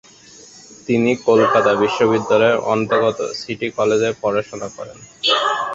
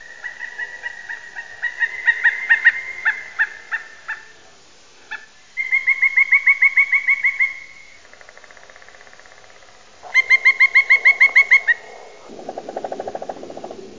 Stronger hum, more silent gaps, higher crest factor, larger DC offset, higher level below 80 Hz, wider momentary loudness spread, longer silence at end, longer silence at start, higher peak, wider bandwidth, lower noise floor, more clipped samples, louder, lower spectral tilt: neither; neither; about the same, 16 dB vs 18 dB; second, under 0.1% vs 0.5%; first, -56 dBFS vs -68 dBFS; second, 15 LU vs 22 LU; about the same, 0 s vs 0.1 s; first, 0.7 s vs 0 s; about the same, -2 dBFS vs -2 dBFS; about the same, 7.8 kHz vs 7.6 kHz; second, -44 dBFS vs -49 dBFS; neither; second, -17 LUFS vs -14 LUFS; first, -4.5 dB/octave vs -1 dB/octave